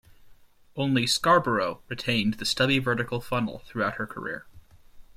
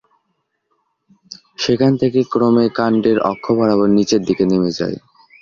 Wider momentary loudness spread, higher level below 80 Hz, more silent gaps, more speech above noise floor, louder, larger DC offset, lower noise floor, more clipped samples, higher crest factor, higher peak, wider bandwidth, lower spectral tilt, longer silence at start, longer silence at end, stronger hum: about the same, 12 LU vs 11 LU; about the same, -54 dBFS vs -52 dBFS; neither; second, 27 dB vs 55 dB; second, -26 LUFS vs -16 LUFS; neither; second, -53 dBFS vs -70 dBFS; neither; first, 20 dB vs 14 dB; second, -8 dBFS vs -2 dBFS; first, 16 kHz vs 7.4 kHz; second, -4.5 dB/octave vs -6.5 dB/octave; second, 0.2 s vs 1.3 s; second, 0.05 s vs 0.45 s; neither